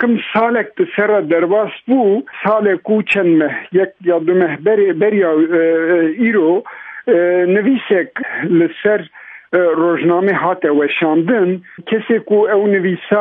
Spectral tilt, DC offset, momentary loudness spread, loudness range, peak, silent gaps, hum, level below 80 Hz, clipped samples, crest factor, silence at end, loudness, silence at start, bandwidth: -8.5 dB/octave; under 0.1%; 5 LU; 2 LU; 0 dBFS; none; none; -66 dBFS; under 0.1%; 14 dB; 0 s; -14 LUFS; 0 s; 4 kHz